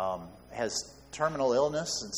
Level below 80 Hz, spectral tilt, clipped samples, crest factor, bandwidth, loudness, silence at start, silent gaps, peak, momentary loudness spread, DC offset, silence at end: -60 dBFS; -3 dB/octave; under 0.1%; 18 dB; 19.5 kHz; -31 LUFS; 0 s; none; -14 dBFS; 14 LU; under 0.1%; 0 s